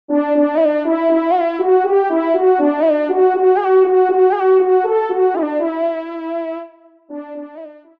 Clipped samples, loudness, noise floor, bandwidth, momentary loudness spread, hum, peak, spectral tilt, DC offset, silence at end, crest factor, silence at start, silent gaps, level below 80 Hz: under 0.1%; -15 LUFS; -39 dBFS; 4.6 kHz; 17 LU; none; -4 dBFS; -7 dB/octave; 0.1%; 0.25 s; 12 dB; 0.1 s; none; -70 dBFS